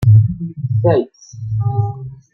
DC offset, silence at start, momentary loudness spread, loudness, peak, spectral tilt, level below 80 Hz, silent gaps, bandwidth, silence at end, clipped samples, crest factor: under 0.1%; 0 s; 18 LU; -17 LUFS; -2 dBFS; -9.5 dB/octave; -42 dBFS; none; 6.2 kHz; 0.2 s; under 0.1%; 14 dB